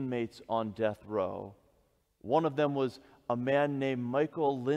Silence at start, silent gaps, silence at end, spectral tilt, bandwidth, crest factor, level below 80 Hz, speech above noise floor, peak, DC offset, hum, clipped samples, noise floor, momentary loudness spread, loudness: 0 s; none; 0 s; -7.5 dB/octave; 11 kHz; 18 dB; -70 dBFS; 40 dB; -14 dBFS; under 0.1%; none; under 0.1%; -71 dBFS; 9 LU; -32 LUFS